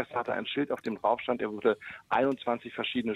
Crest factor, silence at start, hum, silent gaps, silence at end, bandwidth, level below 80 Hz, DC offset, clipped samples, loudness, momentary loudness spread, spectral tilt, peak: 16 dB; 0 s; none; none; 0 s; 12 kHz; -68 dBFS; under 0.1%; under 0.1%; -31 LUFS; 4 LU; -6.5 dB/octave; -14 dBFS